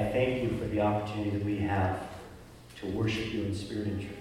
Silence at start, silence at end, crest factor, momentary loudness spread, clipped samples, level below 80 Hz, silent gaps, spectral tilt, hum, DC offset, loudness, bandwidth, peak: 0 s; 0 s; 16 dB; 15 LU; under 0.1%; -52 dBFS; none; -7 dB/octave; none; under 0.1%; -32 LUFS; 15 kHz; -16 dBFS